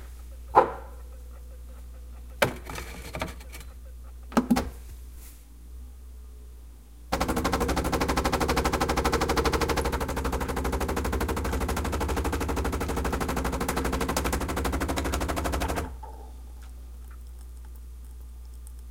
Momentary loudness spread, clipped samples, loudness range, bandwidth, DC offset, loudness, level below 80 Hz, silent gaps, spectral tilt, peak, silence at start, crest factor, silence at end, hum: 20 LU; under 0.1%; 8 LU; 17 kHz; 0.1%; -28 LUFS; -36 dBFS; none; -5 dB/octave; -2 dBFS; 0 s; 26 dB; 0 s; none